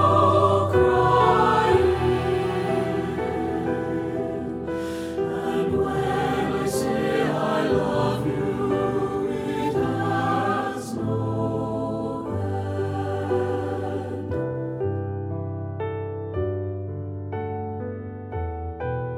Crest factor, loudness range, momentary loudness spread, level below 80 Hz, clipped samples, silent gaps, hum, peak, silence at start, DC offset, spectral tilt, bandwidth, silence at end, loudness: 18 dB; 8 LU; 12 LU; -44 dBFS; under 0.1%; none; none; -6 dBFS; 0 s; under 0.1%; -7 dB/octave; 15.5 kHz; 0 s; -24 LUFS